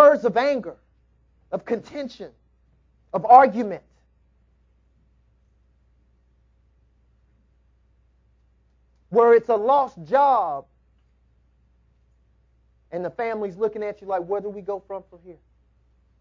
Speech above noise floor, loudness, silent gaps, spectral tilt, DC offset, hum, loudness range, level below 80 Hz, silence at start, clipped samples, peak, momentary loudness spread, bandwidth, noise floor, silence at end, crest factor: 41 dB; -21 LUFS; none; -7 dB/octave; under 0.1%; none; 10 LU; -62 dBFS; 0 s; under 0.1%; 0 dBFS; 21 LU; 7.2 kHz; -62 dBFS; 0.9 s; 24 dB